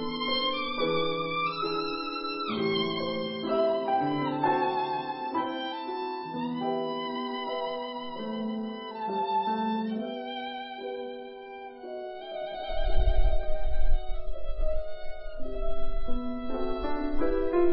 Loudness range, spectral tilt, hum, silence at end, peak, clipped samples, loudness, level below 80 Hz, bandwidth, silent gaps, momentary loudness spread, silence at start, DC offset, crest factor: 7 LU; -9.5 dB/octave; none; 0 s; -10 dBFS; under 0.1%; -31 LUFS; -34 dBFS; 5.8 kHz; none; 11 LU; 0 s; under 0.1%; 16 dB